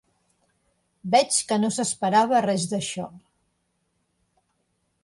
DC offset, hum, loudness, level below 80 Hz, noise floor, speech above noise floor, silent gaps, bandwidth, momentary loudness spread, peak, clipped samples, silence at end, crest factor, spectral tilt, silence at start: under 0.1%; none; -22 LUFS; -68 dBFS; -73 dBFS; 50 dB; none; 11.5 kHz; 14 LU; -6 dBFS; under 0.1%; 1.85 s; 20 dB; -3.5 dB/octave; 1.05 s